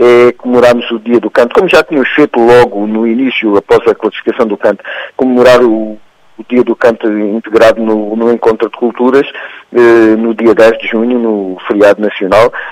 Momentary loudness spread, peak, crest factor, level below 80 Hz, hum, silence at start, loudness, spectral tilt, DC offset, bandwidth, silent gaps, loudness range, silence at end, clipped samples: 8 LU; 0 dBFS; 8 dB; -44 dBFS; none; 0 s; -9 LUFS; -6 dB/octave; under 0.1%; 13.5 kHz; none; 2 LU; 0 s; 2%